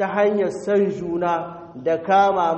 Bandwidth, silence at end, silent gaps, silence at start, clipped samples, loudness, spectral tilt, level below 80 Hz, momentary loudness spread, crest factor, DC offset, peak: 8.4 kHz; 0 s; none; 0 s; under 0.1%; -21 LUFS; -6.5 dB/octave; -58 dBFS; 9 LU; 14 dB; under 0.1%; -6 dBFS